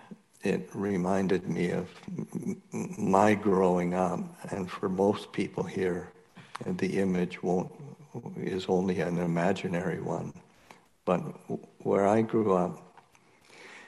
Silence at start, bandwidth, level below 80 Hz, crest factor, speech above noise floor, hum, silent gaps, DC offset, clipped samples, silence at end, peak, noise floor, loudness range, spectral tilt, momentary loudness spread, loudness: 0.1 s; 12 kHz; -70 dBFS; 22 dB; 32 dB; none; none; under 0.1%; under 0.1%; 0 s; -8 dBFS; -61 dBFS; 4 LU; -7 dB/octave; 15 LU; -30 LUFS